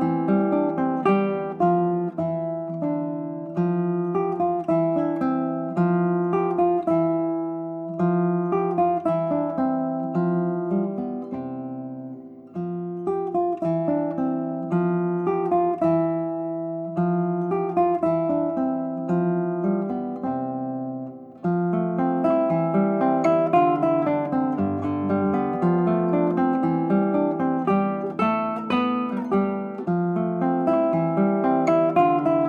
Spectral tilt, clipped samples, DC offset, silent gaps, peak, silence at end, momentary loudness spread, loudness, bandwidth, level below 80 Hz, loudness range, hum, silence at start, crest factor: -10 dB/octave; under 0.1%; under 0.1%; none; -8 dBFS; 0 s; 8 LU; -23 LUFS; 7 kHz; -66 dBFS; 5 LU; none; 0 s; 16 dB